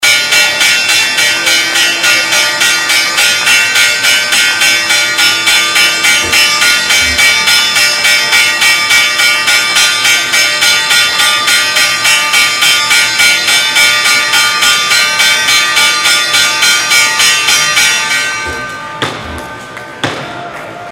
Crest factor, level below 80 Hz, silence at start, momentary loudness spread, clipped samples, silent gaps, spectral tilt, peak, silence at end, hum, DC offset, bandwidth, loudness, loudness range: 10 dB; -42 dBFS; 0 s; 11 LU; 0.7%; none; 1 dB/octave; 0 dBFS; 0 s; none; under 0.1%; over 20 kHz; -6 LUFS; 2 LU